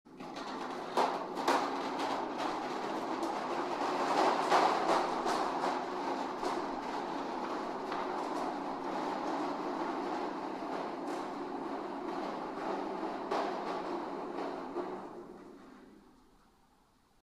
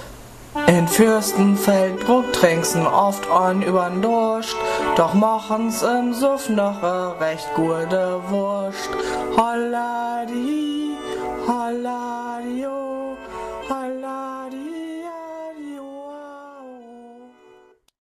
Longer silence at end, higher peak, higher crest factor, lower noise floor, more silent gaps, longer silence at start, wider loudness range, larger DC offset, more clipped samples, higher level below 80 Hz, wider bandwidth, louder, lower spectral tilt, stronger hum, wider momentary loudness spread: first, 1.2 s vs 0.75 s; second, -14 dBFS vs 0 dBFS; about the same, 22 dB vs 20 dB; first, -68 dBFS vs -52 dBFS; neither; about the same, 0.05 s vs 0 s; second, 7 LU vs 14 LU; neither; neither; second, -68 dBFS vs -52 dBFS; about the same, 15 kHz vs 14 kHz; second, -36 LUFS vs -21 LUFS; about the same, -4 dB/octave vs -5 dB/octave; neither; second, 10 LU vs 17 LU